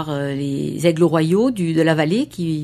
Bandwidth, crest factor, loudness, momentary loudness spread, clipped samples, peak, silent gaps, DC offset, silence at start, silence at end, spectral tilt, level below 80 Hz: 13.5 kHz; 16 dB; -18 LUFS; 7 LU; under 0.1%; -2 dBFS; none; under 0.1%; 0 s; 0 s; -6.5 dB/octave; -54 dBFS